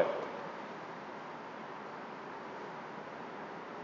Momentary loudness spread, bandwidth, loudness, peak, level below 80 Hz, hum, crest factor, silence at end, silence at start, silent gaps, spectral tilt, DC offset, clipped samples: 4 LU; 7.6 kHz; -44 LUFS; -16 dBFS; -82 dBFS; none; 26 dB; 0 s; 0 s; none; -5.5 dB/octave; under 0.1%; under 0.1%